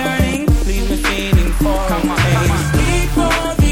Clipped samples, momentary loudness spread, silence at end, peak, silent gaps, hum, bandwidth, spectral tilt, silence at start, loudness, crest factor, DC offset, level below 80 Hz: under 0.1%; 3 LU; 0 s; 0 dBFS; none; none; 17 kHz; -5.5 dB/octave; 0 s; -16 LUFS; 14 dB; under 0.1%; -18 dBFS